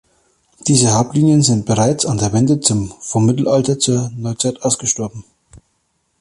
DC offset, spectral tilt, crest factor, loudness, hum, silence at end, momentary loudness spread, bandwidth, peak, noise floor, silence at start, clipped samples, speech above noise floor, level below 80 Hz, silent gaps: under 0.1%; -5 dB/octave; 16 dB; -15 LUFS; none; 0.65 s; 9 LU; 11.5 kHz; 0 dBFS; -66 dBFS; 0.65 s; under 0.1%; 51 dB; -46 dBFS; none